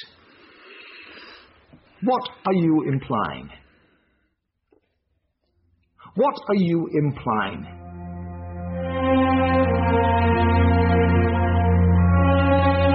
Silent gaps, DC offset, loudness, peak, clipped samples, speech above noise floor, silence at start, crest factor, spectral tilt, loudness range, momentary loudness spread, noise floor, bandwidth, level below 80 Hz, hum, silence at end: none; under 0.1%; -20 LUFS; -8 dBFS; under 0.1%; 50 dB; 0 s; 14 dB; -6.5 dB/octave; 10 LU; 19 LU; -73 dBFS; 5.6 kHz; -36 dBFS; none; 0 s